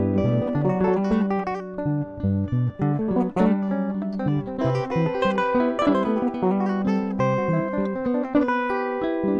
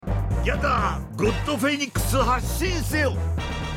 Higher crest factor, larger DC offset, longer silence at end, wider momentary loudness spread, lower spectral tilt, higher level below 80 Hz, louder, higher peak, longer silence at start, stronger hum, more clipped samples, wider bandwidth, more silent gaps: about the same, 16 dB vs 14 dB; neither; about the same, 0 s vs 0 s; about the same, 5 LU vs 5 LU; first, -9 dB/octave vs -5 dB/octave; second, -50 dBFS vs -30 dBFS; about the same, -23 LUFS vs -24 LUFS; about the same, -8 dBFS vs -10 dBFS; about the same, 0 s vs 0.05 s; neither; neither; second, 7.4 kHz vs 16.5 kHz; neither